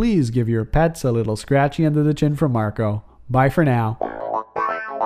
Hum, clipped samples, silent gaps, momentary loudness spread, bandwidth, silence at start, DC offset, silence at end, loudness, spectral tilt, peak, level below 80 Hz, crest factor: none; under 0.1%; none; 7 LU; 14.5 kHz; 0 s; under 0.1%; 0 s; -20 LUFS; -7.5 dB/octave; -4 dBFS; -36 dBFS; 16 dB